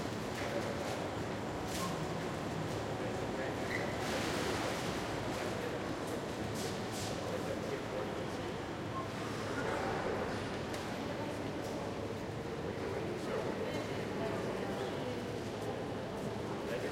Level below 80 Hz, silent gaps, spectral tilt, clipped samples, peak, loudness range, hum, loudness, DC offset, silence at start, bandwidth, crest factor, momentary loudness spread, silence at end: -58 dBFS; none; -5 dB/octave; under 0.1%; -24 dBFS; 2 LU; none; -39 LUFS; under 0.1%; 0 s; 16.5 kHz; 14 dB; 4 LU; 0 s